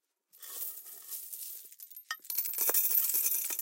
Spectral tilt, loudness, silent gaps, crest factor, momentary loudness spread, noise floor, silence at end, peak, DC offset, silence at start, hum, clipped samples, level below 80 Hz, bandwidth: 3 dB/octave; -30 LUFS; none; 22 dB; 20 LU; -54 dBFS; 0 s; -12 dBFS; under 0.1%; 0.35 s; none; under 0.1%; under -90 dBFS; 17 kHz